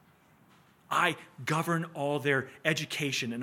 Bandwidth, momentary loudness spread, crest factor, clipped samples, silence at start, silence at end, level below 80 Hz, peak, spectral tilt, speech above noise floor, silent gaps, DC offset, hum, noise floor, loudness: 17 kHz; 5 LU; 22 dB; under 0.1%; 0.9 s; 0 s; -78 dBFS; -10 dBFS; -4.5 dB/octave; 31 dB; none; under 0.1%; none; -62 dBFS; -30 LUFS